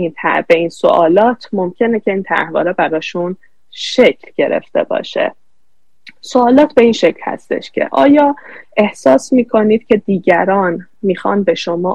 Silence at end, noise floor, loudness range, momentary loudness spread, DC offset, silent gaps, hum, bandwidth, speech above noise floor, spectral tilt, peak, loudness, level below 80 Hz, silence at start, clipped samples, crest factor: 0 s; -68 dBFS; 4 LU; 10 LU; 0.8%; none; none; 10 kHz; 56 dB; -5.5 dB/octave; 0 dBFS; -13 LUFS; -54 dBFS; 0 s; 0.4%; 14 dB